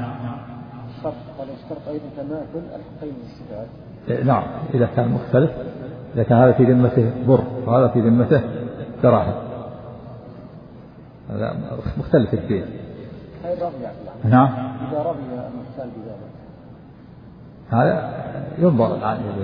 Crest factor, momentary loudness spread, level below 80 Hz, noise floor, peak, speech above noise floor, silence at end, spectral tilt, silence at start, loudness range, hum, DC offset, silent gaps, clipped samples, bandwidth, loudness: 20 dB; 21 LU; -48 dBFS; -42 dBFS; -2 dBFS; 23 dB; 0 s; -12 dB/octave; 0 s; 12 LU; none; under 0.1%; none; under 0.1%; 5.2 kHz; -20 LUFS